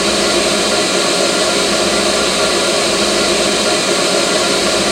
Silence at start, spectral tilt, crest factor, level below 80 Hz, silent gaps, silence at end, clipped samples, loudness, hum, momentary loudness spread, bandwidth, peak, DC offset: 0 s; -2 dB/octave; 14 dB; -40 dBFS; none; 0 s; under 0.1%; -12 LUFS; none; 0 LU; 16.5 kHz; 0 dBFS; under 0.1%